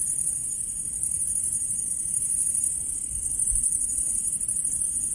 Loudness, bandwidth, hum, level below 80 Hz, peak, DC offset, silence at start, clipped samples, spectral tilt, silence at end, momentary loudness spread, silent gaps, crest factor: -23 LUFS; 11.5 kHz; none; -46 dBFS; -10 dBFS; under 0.1%; 0 s; under 0.1%; -1.5 dB/octave; 0 s; 5 LU; none; 18 dB